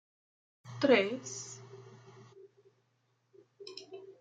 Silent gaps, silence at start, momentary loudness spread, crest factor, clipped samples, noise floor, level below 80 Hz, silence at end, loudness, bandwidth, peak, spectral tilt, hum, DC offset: none; 0.65 s; 27 LU; 26 dB; under 0.1%; -76 dBFS; -86 dBFS; 0.1 s; -31 LUFS; 9.4 kHz; -12 dBFS; -4 dB/octave; none; under 0.1%